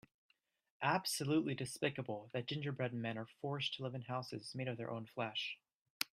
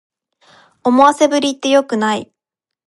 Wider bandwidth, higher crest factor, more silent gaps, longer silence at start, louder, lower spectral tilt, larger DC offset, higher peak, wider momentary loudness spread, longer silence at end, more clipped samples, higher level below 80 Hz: first, 15.5 kHz vs 11.5 kHz; first, 28 dB vs 16 dB; first, 5.75-6.00 s vs none; about the same, 0.8 s vs 0.85 s; second, -41 LUFS vs -14 LUFS; about the same, -4.5 dB/octave vs -3.5 dB/octave; neither; second, -14 dBFS vs 0 dBFS; about the same, 9 LU vs 9 LU; second, 0.1 s vs 0.65 s; neither; second, -80 dBFS vs -64 dBFS